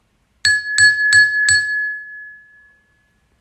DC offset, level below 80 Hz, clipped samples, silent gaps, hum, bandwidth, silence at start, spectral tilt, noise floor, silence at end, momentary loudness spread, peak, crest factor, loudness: under 0.1%; -56 dBFS; under 0.1%; none; none; 13 kHz; 0.45 s; 2.5 dB/octave; -60 dBFS; 1.05 s; 18 LU; 0 dBFS; 16 dB; -13 LUFS